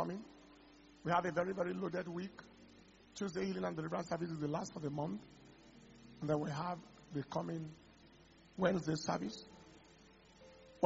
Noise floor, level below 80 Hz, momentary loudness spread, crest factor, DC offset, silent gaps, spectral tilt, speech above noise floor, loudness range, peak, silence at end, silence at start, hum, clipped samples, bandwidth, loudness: -64 dBFS; -70 dBFS; 24 LU; 28 dB; under 0.1%; none; -5.5 dB/octave; 24 dB; 3 LU; -14 dBFS; 0 s; 0 s; none; under 0.1%; 7.6 kHz; -41 LUFS